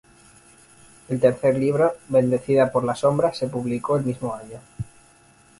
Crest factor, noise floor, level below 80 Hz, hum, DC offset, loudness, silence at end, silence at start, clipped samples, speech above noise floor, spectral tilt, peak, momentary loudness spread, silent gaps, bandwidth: 20 dB; -54 dBFS; -54 dBFS; none; under 0.1%; -22 LUFS; 0.75 s; 1.1 s; under 0.1%; 33 dB; -7 dB/octave; -4 dBFS; 17 LU; none; 11.5 kHz